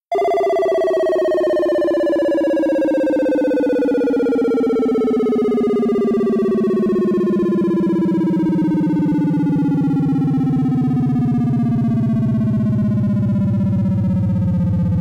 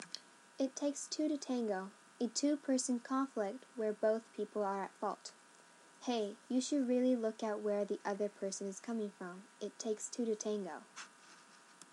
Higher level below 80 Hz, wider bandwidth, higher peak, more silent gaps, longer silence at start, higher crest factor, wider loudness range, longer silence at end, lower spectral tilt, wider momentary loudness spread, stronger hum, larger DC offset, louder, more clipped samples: first, -44 dBFS vs under -90 dBFS; about the same, 11 kHz vs 12 kHz; first, -10 dBFS vs -22 dBFS; neither; about the same, 0.1 s vs 0 s; second, 6 dB vs 18 dB; second, 0 LU vs 4 LU; about the same, 0 s vs 0.1 s; first, -9.5 dB/octave vs -4 dB/octave; second, 1 LU vs 15 LU; neither; neither; first, -17 LUFS vs -39 LUFS; neither